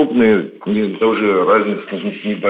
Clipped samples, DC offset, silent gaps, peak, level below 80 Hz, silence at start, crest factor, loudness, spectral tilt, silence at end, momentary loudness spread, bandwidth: under 0.1%; under 0.1%; none; -2 dBFS; -58 dBFS; 0 s; 14 dB; -16 LUFS; -8.5 dB/octave; 0 s; 10 LU; 4.8 kHz